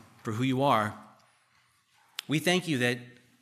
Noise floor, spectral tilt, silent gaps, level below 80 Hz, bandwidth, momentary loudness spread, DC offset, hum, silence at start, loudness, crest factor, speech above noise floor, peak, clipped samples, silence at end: -67 dBFS; -5 dB/octave; none; -76 dBFS; 15 kHz; 15 LU; under 0.1%; none; 0.25 s; -28 LUFS; 20 dB; 40 dB; -10 dBFS; under 0.1%; 0.3 s